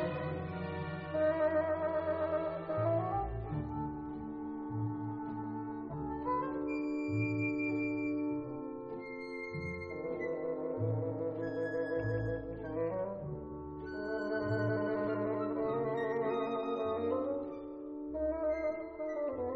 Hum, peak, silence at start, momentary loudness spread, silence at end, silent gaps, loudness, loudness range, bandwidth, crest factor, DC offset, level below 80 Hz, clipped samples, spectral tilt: none; -22 dBFS; 0 s; 9 LU; 0 s; none; -37 LUFS; 4 LU; 7.2 kHz; 14 dB; under 0.1%; -56 dBFS; under 0.1%; -7 dB/octave